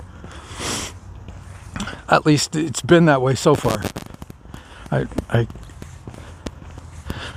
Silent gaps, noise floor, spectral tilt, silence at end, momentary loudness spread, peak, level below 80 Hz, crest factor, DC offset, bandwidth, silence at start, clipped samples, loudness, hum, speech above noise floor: none; -40 dBFS; -5.5 dB/octave; 0 s; 23 LU; 0 dBFS; -42 dBFS; 20 dB; under 0.1%; 15.5 kHz; 0 s; under 0.1%; -19 LUFS; none; 22 dB